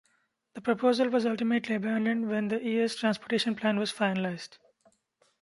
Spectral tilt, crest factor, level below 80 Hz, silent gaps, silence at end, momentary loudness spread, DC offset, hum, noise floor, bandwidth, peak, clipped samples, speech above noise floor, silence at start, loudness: -5.5 dB/octave; 18 dB; -76 dBFS; none; 0.85 s; 8 LU; under 0.1%; none; -73 dBFS; 11.5 kHz; -10 dBFS; under 0.1%; 44 dB; 0.55 s; -29 LUFS